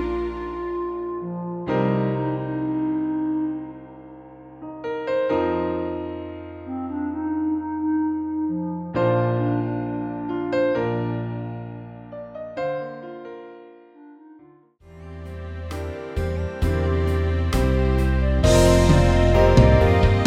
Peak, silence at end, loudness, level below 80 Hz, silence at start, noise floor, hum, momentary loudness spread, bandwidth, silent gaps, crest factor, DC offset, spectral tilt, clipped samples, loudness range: -2 dBFS; 0 s; -23 LUFS; -30 dBFS; 0 s; -51 dBFS; none; 20 LU; 15 kHz; none; 20 dB; under 0.1%; -7 dB/octave; under 0.1%; 15 LU